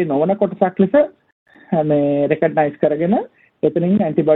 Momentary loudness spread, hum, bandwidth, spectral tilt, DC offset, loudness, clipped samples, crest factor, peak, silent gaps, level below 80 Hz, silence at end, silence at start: 6 LU; none; 4 kHz; -11.5 dB/octave; under 0.1%; -17 LUFS; under 0.1%; 16 dB; -2 dBFS; 1.32-1.46 s; -60 dBFS; 0 s; 0 s